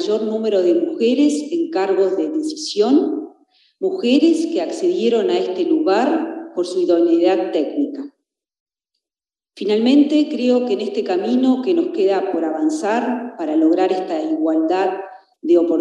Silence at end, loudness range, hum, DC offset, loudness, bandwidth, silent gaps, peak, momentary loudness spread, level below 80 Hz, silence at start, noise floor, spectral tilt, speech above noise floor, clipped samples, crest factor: 0 s; 2 LU; none; under 0.1%; -18 LUFS; 10.5 kHz; 8.60-8.66 s; -2 dBFS; 9 LU; -82 dBFS; 0 s; under -90 dBFS; -5 dB/octave; over 73 dB; under 0.1%; 14 dB